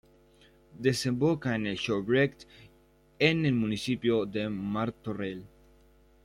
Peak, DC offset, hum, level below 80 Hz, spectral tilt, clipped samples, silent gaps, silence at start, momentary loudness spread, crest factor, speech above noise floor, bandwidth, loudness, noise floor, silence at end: -10 dBFS; under 0.1%; none; -60 dBFS; -6 dB/octave; under 0.1%; none; 0.75 s; 9 LU; 20 dB; 33 dB; 15.5 kHz; -29 LUFS; -62 dBFS; 0.8 s